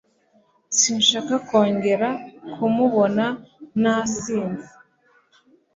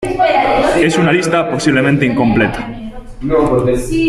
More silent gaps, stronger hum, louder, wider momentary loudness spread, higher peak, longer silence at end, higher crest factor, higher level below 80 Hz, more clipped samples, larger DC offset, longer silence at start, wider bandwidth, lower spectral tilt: neither; neither; second, -21 LUFS vs -13 LUFS; about the same, 12 LU vs 13 LU; second, -4 dBFS vs 0 dBFS; first, 1.1 s vs 0 s; first, 18 dB vs 12 dB; second, -62 dBFS vs -30 dBFS; neither; neither; first, 0.7 s vs 0 s; second, 7.8 kHz vs 13.5 kHz; second, -3 dB/octave vs -6 dB/octave